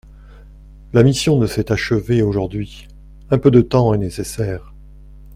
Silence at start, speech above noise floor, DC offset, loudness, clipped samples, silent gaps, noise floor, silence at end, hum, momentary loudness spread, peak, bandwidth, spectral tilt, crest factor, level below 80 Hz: 0.3 s; 24 dB; under 0.1%; -17 LUFS; under 0.1%; none; -40 dBFS; 0 s; 50 Hz at -35 dBFS; 12 LU; 0 dBFS; 15.5 kHz; -6.5 dB/octave; 18 dB; -38 dBFS